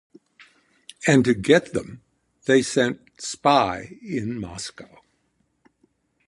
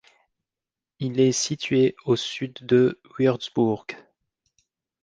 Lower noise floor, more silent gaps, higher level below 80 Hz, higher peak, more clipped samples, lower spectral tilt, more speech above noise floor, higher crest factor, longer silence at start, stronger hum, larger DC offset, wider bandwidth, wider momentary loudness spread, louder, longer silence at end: second, -70 dBFS vs -90 dBFS; neither; first, -56 dBFS vs -64 dBFS; first, -2 dBFS vs -8 dBFS; neither; about the same, -5 dB/octave vs -5 dB/octave; second, 48 dB vs 67 dB; about the same, 22 dB vs 18 dB; about the same, 1 s vs 1 s; neither; neither; first, 11.5 kHz vs 10 kHz; first, 15 LU vs 12 LU; about the same, -22 LUFS vs -23 LUFS; first, 1.45 s vs 1.05 s